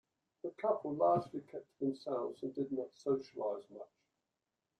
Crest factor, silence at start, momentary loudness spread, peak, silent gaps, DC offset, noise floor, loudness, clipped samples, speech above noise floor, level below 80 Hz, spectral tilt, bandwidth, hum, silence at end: 20 dB; 0.45 s; 17 LU; -20 dBFS; none; under 0.1%; -89 dBFS; -38 LUFS; under 0.1%; 52 dB; -80 dBFS; -8 dB/octave; 9.2 kHz; none; 0.95 s